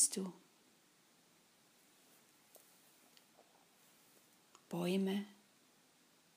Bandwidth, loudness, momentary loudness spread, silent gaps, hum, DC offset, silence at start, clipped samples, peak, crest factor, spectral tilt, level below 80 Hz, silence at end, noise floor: 15.5 kHz; -40 LUFS; 29 LU; none; none; under 0.1%; 0 s; under 0.1%; -20 dBFS; 26 dB; -3.5 dB/octave; under -90 dBFS; 1.05 s; -71 dBFS